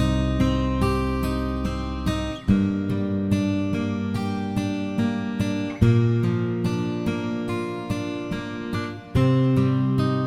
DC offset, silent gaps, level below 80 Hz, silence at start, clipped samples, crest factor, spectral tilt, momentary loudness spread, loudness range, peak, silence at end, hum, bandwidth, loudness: under 0.1%; none; -36 dBFS; 0 s; under 0.1%; 20 dB; -7.5 dB/octave; 8 LU; 1 LU; -4 dBFS; 0 s; none; 14.5 kHz; -24 LUFS